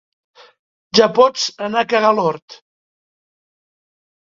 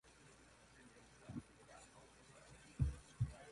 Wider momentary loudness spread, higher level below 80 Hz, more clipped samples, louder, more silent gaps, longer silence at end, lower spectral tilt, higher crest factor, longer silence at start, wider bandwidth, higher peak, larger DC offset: second, 8 LU vs 21 LU; second, -64 dBFS vs -56 dBFS; neither; first, -15 LUFS vs -47 LUFS; first, 2.42-2.48 s vs none; first, 1.7 s vs 0 s; second, -3.5 dB/octave vs -6.5 dB/octave; about the same, 20 dB vs 24 dB; first, 0.95 s vs 0.05 s; second, 7.6 kHz vs 11.5 kHz; first, 0 dBFS vs -26 dBFS; neither